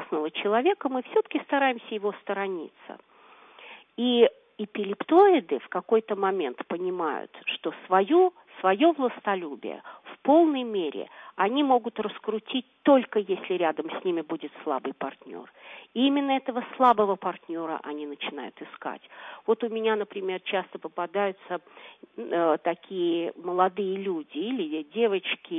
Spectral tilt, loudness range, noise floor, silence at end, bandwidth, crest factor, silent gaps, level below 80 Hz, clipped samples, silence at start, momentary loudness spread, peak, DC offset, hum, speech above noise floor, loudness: -7.5 dB/octave; 6 LU; -53 dBFS; 0 s; 3.9 kHz; 20 dB; none; -82 dBFS; under 0.1%; 0 s; 16 LU; -6 dBFS; under 0.1%; none; 27 dB; -26 LUFS